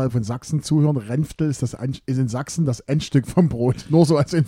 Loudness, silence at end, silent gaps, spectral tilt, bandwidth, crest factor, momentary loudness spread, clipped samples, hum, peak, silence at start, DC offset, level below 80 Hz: -21 LUFS; 0 s; none; -7 dB/octave; 13 kHz; 18 dB; 8 LU; under 0.1%; none; -2 dBFS; 0 s; under 0.1%; -48 dBFS